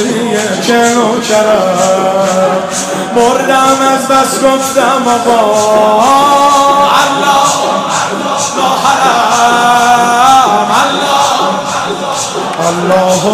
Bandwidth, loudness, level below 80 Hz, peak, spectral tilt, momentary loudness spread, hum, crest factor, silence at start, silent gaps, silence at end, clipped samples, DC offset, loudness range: 16 kHz; -9 LUFS; -48 dBFS; 0 dBFS; -3 dB/octave; 6 LU; none; 8 dB; 0 s; none; 0 s; 0.3%; under 0.1%; 2 LU